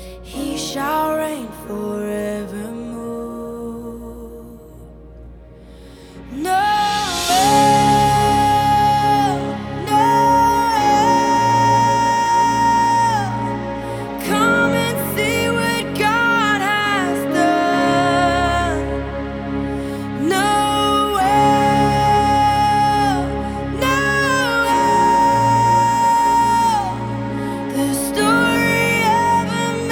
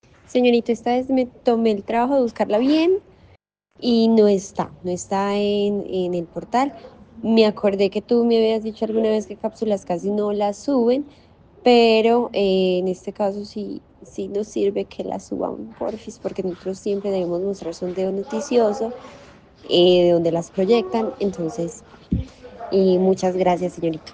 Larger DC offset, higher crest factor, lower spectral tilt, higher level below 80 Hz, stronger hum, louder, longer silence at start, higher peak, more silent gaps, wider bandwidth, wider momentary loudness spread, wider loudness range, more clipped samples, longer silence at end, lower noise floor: neither; about the same, 14 dB vs 18 dB; second, -4.5 dB/octave vs -6 dB/octave; first, -38 dBFS vs -50 dBFS; neither; first, -16 LUFS vs -21 LUFS; second, 0 s vs 0.3 s; about the same, -2 dBFS vs -4 dBFS; neither; first, 20 kHz vs 9.4 kHz; about the same, 12 LU vs 12 LU; first, 10 LU vs 7 LU; neither; about the same, 0 s vs 0.05 s; second, -40 dBFS vs -56 dBFS